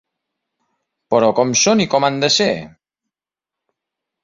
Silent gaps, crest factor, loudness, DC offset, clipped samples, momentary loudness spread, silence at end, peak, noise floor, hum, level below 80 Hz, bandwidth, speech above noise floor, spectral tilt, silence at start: none; 18 dB; -15 LUFS; under 0.1%; under 0.1%; 6 LU; 1.55 s; -2 dBFS; -88 dBFS; none; -58 dBFS; 7.8 kHz; 72 dB; -3 dB/octave; 1.1 s